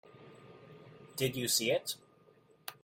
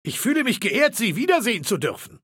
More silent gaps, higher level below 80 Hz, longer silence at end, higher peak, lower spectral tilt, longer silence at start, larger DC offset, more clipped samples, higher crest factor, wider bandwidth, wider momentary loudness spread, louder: neither; second, -74 dBFS vs -68 dBFS; about the same, 0.1 s vs 0.05 s; second, -16 dBFS vs -6 dBFS; about the same, -2.5 dB/octave vs -3.5 dB/octave; first, 0.2 s vs 0.05 s; neither; neither; first, 22 dB vs 16 dB; about the same, 16.5 kHz vs 17 kHz; first, 25 LU vs 5 LU; second, -33 LUFS vs -21 LUFS